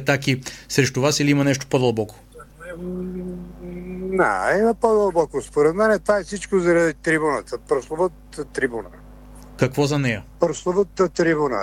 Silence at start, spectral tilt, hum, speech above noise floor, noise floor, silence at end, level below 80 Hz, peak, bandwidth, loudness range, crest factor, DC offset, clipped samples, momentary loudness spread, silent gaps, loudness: 0 s; -5 dB/octave; 50 Hz at -45 dBFS; 22 dB; -42 dBFS; 0 s; -46 dBFS; -4 dBFS; 16.5 kHz; 5 LU; 18 dB; under 0.1%; under 0.1%; 15 LU; none; -21 LUFS